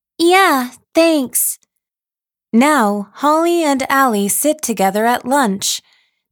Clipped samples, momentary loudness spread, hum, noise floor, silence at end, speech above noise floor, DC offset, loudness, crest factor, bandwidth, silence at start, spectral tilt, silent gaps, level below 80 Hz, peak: under 0.1%; 7 LU; none; under -90 dBFS; 0.5 s; over 76 dB; under 0.1%; -14 LUFS; 14 dB; over 20 kHz; 0.2 s; -3 dB/octave; none; -62 dBFS; 0 dBFS